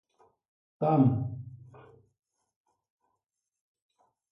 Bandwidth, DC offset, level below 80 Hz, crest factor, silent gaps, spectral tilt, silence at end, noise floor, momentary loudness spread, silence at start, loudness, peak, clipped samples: 5 kHz; under 0.1%; -64 dBFS; 22 dB; none; -12 dB/octave; 2.75 s; -85 dBFS; 20 LU; 0.8 s; -27 LUFS; -12 dBFS; under 0.1%